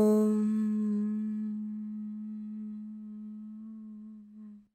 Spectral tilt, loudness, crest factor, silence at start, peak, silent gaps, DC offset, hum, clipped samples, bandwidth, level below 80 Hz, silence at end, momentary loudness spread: -9 dB/octave; -33 LUFS; 14 dB; 0 s; -18 dBFS; none; under 0.1%; none; under 0.1%; 15 kHz; -80 dBFS; 0.15 s; 20 LU